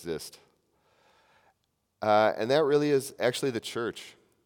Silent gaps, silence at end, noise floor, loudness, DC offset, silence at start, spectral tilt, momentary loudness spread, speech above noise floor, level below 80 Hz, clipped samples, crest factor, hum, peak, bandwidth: none; 0.35 s; -76 dBFS; -27 LUFS; under 0.1%; 0 s; -4.5 dB/octave; 17 LU; 49 dB; -74 dBFS; under 0.1%; 20 dB; none; -10 dBFS; 18 kHz